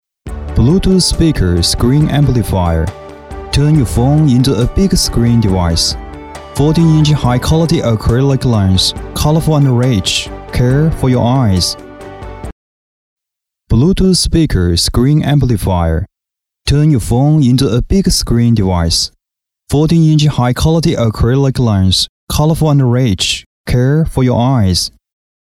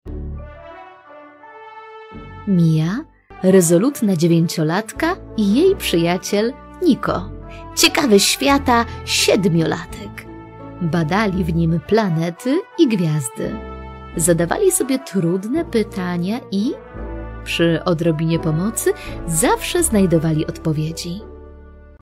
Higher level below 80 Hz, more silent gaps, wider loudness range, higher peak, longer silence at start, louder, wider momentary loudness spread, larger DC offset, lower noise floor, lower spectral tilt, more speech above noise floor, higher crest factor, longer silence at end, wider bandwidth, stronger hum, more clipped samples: first, -24 dBFS vs -38 dBFS; first, 12.52-13.17 s, 22.09-22.27 s, 23.46-23.64 s vs none; about the same, 2 LU vs 4 LU; about the same, 0 dBFS vs 0 dBFS; first, 0.25 s vs 0.05 s; first, -12 LUFS vs -18 LUFS; second, 10 LU vs 18 LU; neither; first, -82 dBFS vs -42 dBFS; about the same, -5.5 dB/octave vs -5 dB/octave; first, 71 dB vs 25 dB; second, 12 dB vs 18 dB; first, 0.6 s vs 0.2 s; about the same, 15.5 kHz vs 16 kHz; neither; neither